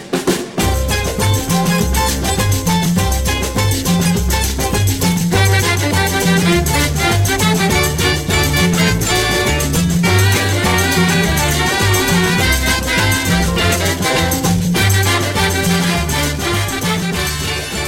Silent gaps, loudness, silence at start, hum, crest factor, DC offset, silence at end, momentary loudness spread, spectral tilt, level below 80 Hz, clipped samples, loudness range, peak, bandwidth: none; -14 LUFS; 0 s; none; 14 dB; under 0.1%; 0 s; 4 LU; -4 dB/octave; -24 dBFS; under 0.1%; 2 LU; 0 dBFS; 17 kHz